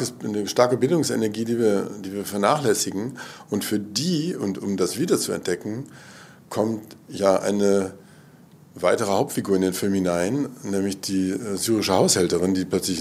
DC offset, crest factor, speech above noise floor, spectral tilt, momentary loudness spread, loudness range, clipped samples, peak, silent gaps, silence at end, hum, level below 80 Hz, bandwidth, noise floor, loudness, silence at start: under 0.1%; 20 dB; 27 dB; -4.5 dB/octave; 11 LU; 3 LU; under 0.1%; -2 dBFS; none; 0 s; none; -66 dBFS; 16 kHz; -49 dBFS; -23 LUFS; 0 s